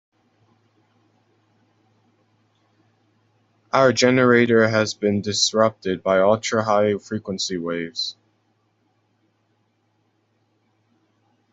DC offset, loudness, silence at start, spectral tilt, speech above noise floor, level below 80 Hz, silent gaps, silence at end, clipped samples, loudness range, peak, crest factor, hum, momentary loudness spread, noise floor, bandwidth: under 0.1%; -19 LUFS; 3.75 s; -4 dB/octave; 48 dB; -64 dBFS; none; 3.4 s; under 0.1%; 13 LU; -2 dBFS; 20 dB; none; 11 LU; -67 dBFS; 8.2 kHz